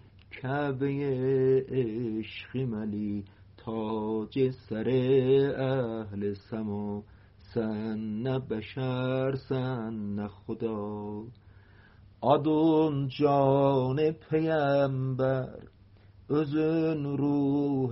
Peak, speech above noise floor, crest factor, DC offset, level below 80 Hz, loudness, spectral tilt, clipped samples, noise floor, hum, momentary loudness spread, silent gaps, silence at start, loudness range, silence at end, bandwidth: -12 dBFS; 27 dB; 18 dB; under 0.1%; -60 dBFS; -29 LUFS; -7 dB/octave; under 0.1%; -55 dBFS; none; 12 LU; none; 0.3 s; 7 LU; 0 s; 5.8 kHz